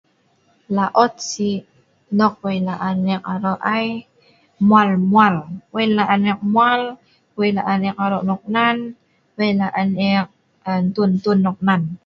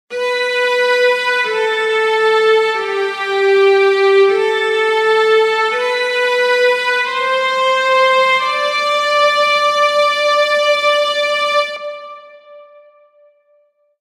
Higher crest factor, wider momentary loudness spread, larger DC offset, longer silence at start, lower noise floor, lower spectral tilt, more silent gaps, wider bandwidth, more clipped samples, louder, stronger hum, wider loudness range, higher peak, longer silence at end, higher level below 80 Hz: first, 18 dB vs 12 dB; first, 11 LU vs 5 LU; neither; first, 0.7 s vs 0.1 s; about the same, -60 dBFS vs -57 dBFS; first, -6 dB/octave vs -1 dB/octave; neither; second, 7.6 kHz vs 15 kHz; neither; second, -18 LUFS vs -13 LUFS; neither; about the same, 4 LU vs 3 LU; about the same, 0 dBFS vs -2 dBFS; second, 0.1 s vs 1.4 s; first, -60 dBFS vs -80 dBFS